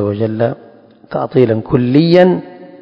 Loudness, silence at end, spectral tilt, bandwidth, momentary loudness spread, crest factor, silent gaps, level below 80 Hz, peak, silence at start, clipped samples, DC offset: -13 LUFS; 0.05 s; -9.5 dB/octave; 6 kHz; 12 LU; 14 dB; none; -46 dBFS; 0 dBFS; 0 s; 0.4%; under 0.1%